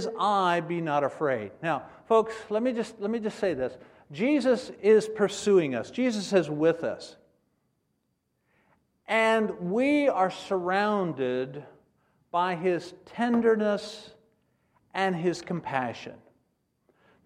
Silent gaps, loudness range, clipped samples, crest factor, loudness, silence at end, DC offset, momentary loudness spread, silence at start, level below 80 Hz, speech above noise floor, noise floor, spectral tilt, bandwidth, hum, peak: none; 5 LU; under 0.1%; 18 dB; -27 LUFS; 1.1 s; under 0.1%; 11 LU; 0 s; -70 dBFS; 50 dB; -76 dBFS; -5.5 dB/octave; 11.5 kHz; none; -10 dBFS